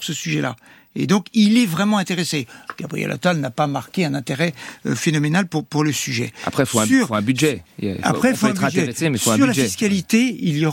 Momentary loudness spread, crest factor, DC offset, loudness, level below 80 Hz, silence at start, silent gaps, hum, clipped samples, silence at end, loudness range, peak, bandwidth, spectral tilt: 10 LU; 16 dB; under 0.1%; -19 LUFS; -58 dBFS; 0 s; none; none; under 0.1%; 0 s; 3 LU; -2 dBFS; 16.5 kHz; -4.5 dB/octave